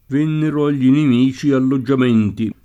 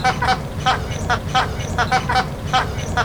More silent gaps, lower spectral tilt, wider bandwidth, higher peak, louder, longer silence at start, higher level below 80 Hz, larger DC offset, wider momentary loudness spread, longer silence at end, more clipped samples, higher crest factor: neither; first, -8 dB/octave vs -4 dB/octave; second, 8 kHz vs over 20 kHz; about the same, -4 dBFS vs -4 dBFS; first, -16 LUFS vs -20 LUFS; about the same, 0.1 s vs 0 s; second, -52 dBFS vs -32 dBFS; second, under 0.1% vs 0.5%; about the same, 4 LU vs 4 LU; first, 0.15 s vs 0 s; neither; about the same, 12 dB vs 16 dB